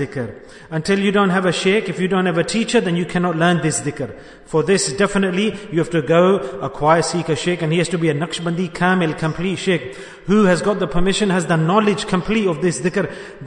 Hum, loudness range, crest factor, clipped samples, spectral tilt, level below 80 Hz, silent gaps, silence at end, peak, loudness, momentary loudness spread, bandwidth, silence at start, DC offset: none; 1 LU; 16 dB; under 0.1%; -5 dB/octave; -40 dBFS; none; 0 s; -2 dBFS; -18 LUFS; 7 LU; 11 kHz; 0 s; under 0.1%